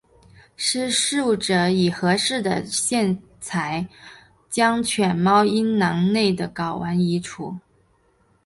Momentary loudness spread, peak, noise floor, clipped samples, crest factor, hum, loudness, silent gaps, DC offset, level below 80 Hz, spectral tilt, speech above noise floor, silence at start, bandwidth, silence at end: 11 LU; -4 dBFS; -62 dBFS; under 0.1%; 18 dB; none; -21 LUFS; none; under 0.1%; -56 dBFS; -4 dB/octave; 41 dB; 0.6 s; 11.5 kHz; 0.85 s